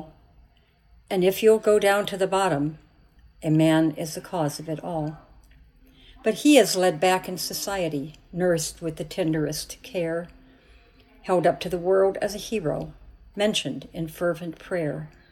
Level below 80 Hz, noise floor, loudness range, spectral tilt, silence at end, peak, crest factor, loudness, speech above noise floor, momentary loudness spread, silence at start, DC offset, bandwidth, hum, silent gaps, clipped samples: -54 dBFS; -58 dBFS; 5 LU; -5 dB/octave; 0.25 s; -4 dBFS; 20 dB; -24 LUFS; 35 dB; 14 LU; 0 s; under 0.1%; 17 kHz; none; none; under 0.1%